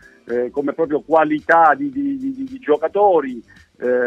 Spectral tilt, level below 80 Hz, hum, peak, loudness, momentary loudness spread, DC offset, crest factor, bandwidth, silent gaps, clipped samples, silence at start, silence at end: -7 dB/octave; -60 dBFS; none; -2 dBFS; -18 LUFS; 13 LU; under 0.1%; 16 dB; 7.8 kHz; none; under 0.1%; 0.25 s; 0 s